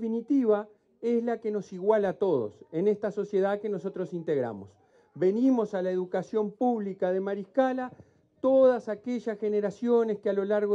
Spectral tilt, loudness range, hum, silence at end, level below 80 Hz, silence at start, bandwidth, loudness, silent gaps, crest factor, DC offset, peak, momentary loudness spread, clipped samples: -8 dB/octave; 2 LU; none; 0 s; -76 dBFS; 0 s; 7.8 kHz; -28 LUFS; none; 16 dB; under 0.1%; -12 dBFS; 8 LU; under 0.1%